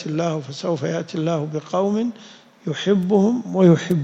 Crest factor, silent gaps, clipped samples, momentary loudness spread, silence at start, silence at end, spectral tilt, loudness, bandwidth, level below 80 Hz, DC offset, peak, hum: 16 dB; none; under 0.1%; 12 LU; 0 s; 0 s; -7 dB/octave; -21 LUFS; 7.8 kHz; -62 dBFS; under 0.1%; -4 dBFS; none